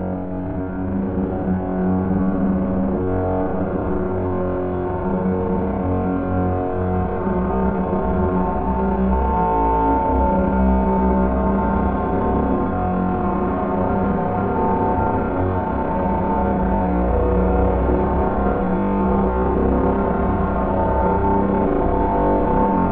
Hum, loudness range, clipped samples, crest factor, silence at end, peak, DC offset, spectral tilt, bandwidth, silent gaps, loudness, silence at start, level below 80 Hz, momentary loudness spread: none; 3 LU; under 0.1%; 14 dB; 0 s; -6 dBFS; under 0.1%; -13 dB/octave; 3.7 kHz; none; -20 LUFS; 0 s; -28 dBFS; 4 LU